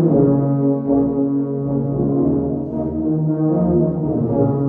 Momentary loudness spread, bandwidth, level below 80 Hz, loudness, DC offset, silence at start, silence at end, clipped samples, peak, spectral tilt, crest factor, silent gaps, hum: 5 LU; 2 kHz; -40 dBFS; -18 LUFS; under 0.1%; 0 s; 0 s; under 0.1%; -2 dBFS; -15 dB/octave; 14 dB; none; none